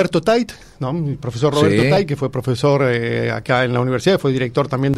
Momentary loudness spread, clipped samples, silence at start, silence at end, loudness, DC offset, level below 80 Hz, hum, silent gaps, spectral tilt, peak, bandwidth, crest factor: 8 LU; under 0.1%; 0 s; 0 s; -18 LUFS; under 0.1%; -46 dBFS; none; none; -6.5 dB/octave; -2 dBFS; 14 kHz; 14 dB